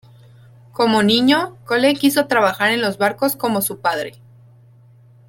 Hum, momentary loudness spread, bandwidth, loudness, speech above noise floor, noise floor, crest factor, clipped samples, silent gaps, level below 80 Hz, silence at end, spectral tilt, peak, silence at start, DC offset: none; 8 LU; 17 kHz; -17 LUFS; 31 dB; -48 dBFS; 18 dB; under 0.1%; none; -60 dBFS; 1.2 s; -3.5 dB/octave; -2 dBFS; 0.8 s; under 0.1%